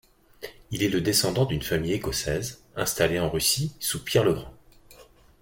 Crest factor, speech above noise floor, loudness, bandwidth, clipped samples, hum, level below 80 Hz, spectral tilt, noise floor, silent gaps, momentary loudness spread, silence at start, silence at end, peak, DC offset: 22 dB; 27 dB; -25 LUFS; 17 kHz; under 0.1%; none; -48 dBFS; -4 dB/octave; -53 dBFS; none; 12 LU; 0.4 s; 0.4 s; -6 dBFS; under 0.1%